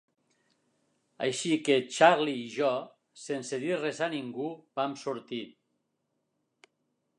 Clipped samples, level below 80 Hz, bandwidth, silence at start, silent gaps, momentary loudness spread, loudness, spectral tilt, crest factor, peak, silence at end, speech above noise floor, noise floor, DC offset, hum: under 0.1%; -86 dBFS; 11 kHz; 1.2 s; none; 16 LU; -30 LUFS; -4 dB/octave; 24 dB; -6 dBFS; 1.7 s; 51 dB; -80 dBFS; under 0.1%; none